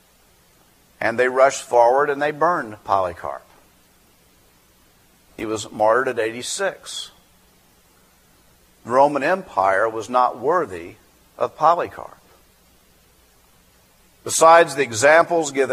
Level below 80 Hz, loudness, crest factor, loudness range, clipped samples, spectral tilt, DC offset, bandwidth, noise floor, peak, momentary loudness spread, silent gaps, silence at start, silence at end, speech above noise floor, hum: -60 dBFS; -19 LUFS; 22 dB; 7 LU; under 0.1%; -3 dB/octave; under 0.1%; 15.5 kHz; -56 dBFS; 0 dBFS; 18 LU; none; 1 s; 0 s; 37 dB; none